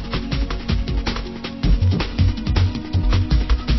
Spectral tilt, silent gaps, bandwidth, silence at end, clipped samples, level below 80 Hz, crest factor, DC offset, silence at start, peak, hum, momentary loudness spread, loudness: -7 dB/octave; none; 6 kHz; 0 s; under 0.1%; -22 dBFS; 14 dB; under 0.1%; 0 s; -4 dBFS; none; 6 LU; -21 LUFS